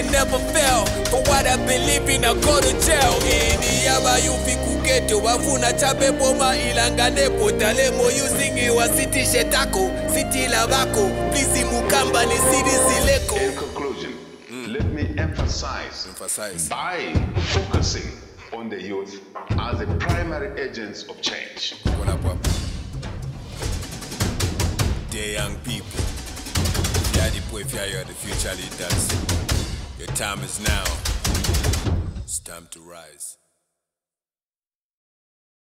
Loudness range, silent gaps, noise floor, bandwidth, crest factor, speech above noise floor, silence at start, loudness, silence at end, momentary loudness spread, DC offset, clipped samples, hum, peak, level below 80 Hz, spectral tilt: 9 LU; none; under -90 dBFS; 16 kHz; 18 dB; over 69 dB; 0 s; -21 LUFS; 2.35 s; 14 LU; under 0.1%; under 0.1%; none; -2 dBFS; -30 dBFS; -3.5 dB/octave